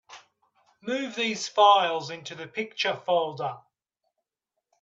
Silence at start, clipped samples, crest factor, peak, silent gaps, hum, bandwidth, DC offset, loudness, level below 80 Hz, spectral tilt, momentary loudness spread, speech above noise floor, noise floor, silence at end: 0.1 s; under 0.1%; 22 dB; -6 dBFS; none; none; 8 kHz; under 0.1%; -25 LUFS; -80 dBFS; -3 dB/octave; 18 LU; 59 dB; -85 dBFS; 1.25 s